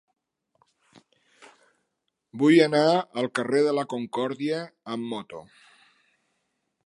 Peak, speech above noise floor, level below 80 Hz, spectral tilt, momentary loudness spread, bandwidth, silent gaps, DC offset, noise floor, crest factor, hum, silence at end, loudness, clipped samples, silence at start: -4 dBFS; 55 dB; -78 dBFS; -6 dB/octave; 17 LU; 11.5 kHz; none; under 0.1%; -79 dBFS; 22 dB; none; 1.45 s; -24 LUFS; under 0.1%; 2.35 s